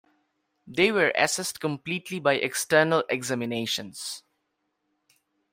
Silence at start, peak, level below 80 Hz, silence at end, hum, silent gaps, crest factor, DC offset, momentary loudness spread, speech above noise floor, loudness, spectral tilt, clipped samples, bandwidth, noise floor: 0.65 s; -6 dBFS; -70 dBFS; 1.35 s; none; none; 22 dB; under 0.1%; 13 LU; 51 dB; -25 LUFS; -3.5 dB/octave; under 0.1%; 16 kHz; -77 dBFS